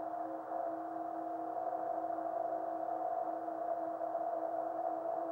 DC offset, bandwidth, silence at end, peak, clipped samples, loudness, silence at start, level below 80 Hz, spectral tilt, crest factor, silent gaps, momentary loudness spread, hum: under 0.1%; 3.7 kHz; 0 s; -26 dBFS; under 0.1%; -39 LUFS; 0 s; -84 dBFS; -7.5 dB/octave; 12 dB; none; 3 LU; none